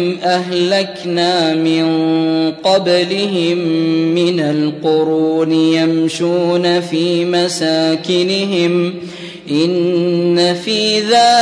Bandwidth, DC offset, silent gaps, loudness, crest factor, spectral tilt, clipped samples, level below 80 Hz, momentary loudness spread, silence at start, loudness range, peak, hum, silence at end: 10.5 kHz; under 0.1%; none; -14 LUFS; 12 dB; -5 dB/octave; under 0.1%; -62 dBFS; 4 LU; 0 s; 1 LU; -2 dBFS; none; 0 s